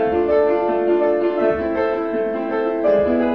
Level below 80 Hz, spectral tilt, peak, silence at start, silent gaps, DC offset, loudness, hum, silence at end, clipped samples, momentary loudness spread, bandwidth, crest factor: -46 dBFS; -8.5 dB/octave; -6 dBFS; 0 s; none; 0.3%; -19 LUFS; none; 0 s; under 0.1%; 5 LU; 5.8 kHz; 12 dB